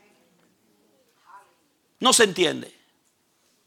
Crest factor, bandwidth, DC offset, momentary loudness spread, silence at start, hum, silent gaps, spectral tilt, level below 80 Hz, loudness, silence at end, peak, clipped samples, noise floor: 22 dB; 16.5 kHz; under 0.1%; 19 LU; 2 s; none; none; -1.5 dB/octave; -74 dBFS; -20 LUFS; 1 s; -4 dBFS; under 0.1%; -67 dBFS